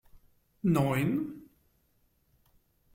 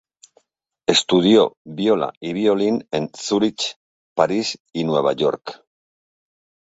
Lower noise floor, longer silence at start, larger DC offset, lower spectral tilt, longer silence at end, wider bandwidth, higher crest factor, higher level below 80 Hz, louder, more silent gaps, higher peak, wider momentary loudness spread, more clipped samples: about the same, -71 dBFS vs -69 dBFS; second, 0.65 s vs 0.9 s; neither; first, -7.5 dB/octave vs -4.5 dB/octave; first, 1.5 s vs 1.15 s; first, 16.5 kHz vs 8 kHz; about the same, 20 dB vs 20 dB; about the same, -62 dBFS vs -62 dBFS; second, -30 LUFS vs -20 LUFS; second, none vs 1.57-1.65 s, 2.17-2.21 s, 3.76-4.16 s, 4.60-4.65 s; second, -12 dBFS vs 0 dBFS; first, 14 LU vs 11 LU; neither